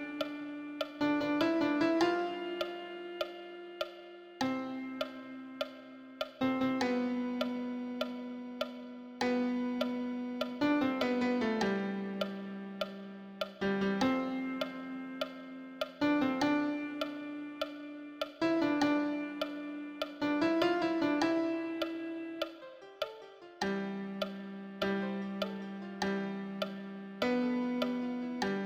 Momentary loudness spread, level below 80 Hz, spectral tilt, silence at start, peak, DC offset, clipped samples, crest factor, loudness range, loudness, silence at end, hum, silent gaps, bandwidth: 13 LU; -70 dBFS; -5.5 dB/octave; 0 s; -16 dBFS; under 0.1%; under 0.1%; 18 dB; 5 LU; -35 LUFS; 0 s; none; none; 16 kHz